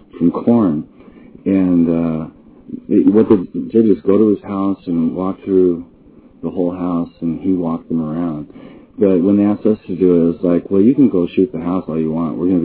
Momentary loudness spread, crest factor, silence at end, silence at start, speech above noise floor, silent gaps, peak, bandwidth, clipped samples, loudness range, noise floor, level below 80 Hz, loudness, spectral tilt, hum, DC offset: 12 LU; 14 dB; 0 s; 0.15 s; 29 dB; none; 0 dBFS; 4 kHz; under 0.1%; 5 LU; -44 dBFS; -46 dBFS; -16 LUFS; -13 dB/octave; none; under 0.1%